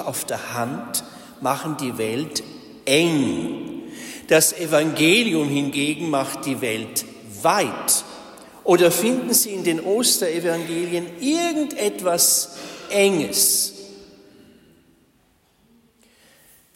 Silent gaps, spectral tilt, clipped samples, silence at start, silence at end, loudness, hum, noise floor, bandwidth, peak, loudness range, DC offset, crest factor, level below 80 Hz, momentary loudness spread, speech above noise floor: none; -3 dB/octave; under 0.1%; 0 s; 2.7 s; -20 LUFS; none; -61 dBFS; 16.5 kHz; -4 dBFS; 4 LU; under 0.1%; 18 dB; -64 dBFS; 13 LU; 40 dB